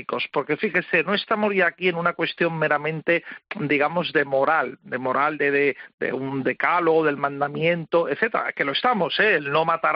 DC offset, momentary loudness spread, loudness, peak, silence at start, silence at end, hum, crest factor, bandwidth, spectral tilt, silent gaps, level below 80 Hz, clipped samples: under 0.1%; 6 LU; -22 LUFS; -6 dBFS; 0 s; 0 s; none; 16 dB; 5.6 kHz; -2.5 dB/octave; 5.94-5.98 s; -70 dBFS; under 0.1%